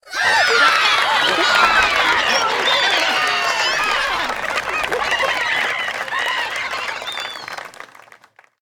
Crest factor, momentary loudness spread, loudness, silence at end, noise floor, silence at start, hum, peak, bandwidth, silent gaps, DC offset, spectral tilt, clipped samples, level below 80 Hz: 18 dB; 12 LU; -16 LUFS; 0.75 s; -49 dBFS; 0.05 s; none; 0 dBFS; 19.5 kHz; none; under 0.1%; -0.5 dB/octave; under 0.1%; -50 dBFS